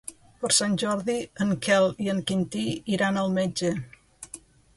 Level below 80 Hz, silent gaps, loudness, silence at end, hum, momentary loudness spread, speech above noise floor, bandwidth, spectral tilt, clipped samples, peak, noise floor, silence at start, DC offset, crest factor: -60 dBFS; none; -25 LUFS; 0.4 s; none; 20 LU; 23 dB; 11.5 kHz; -4 dB/octave; under 0.1%; -8 dBFS; -48 dBFS; 0.05 s; under 0.1%; 18 dB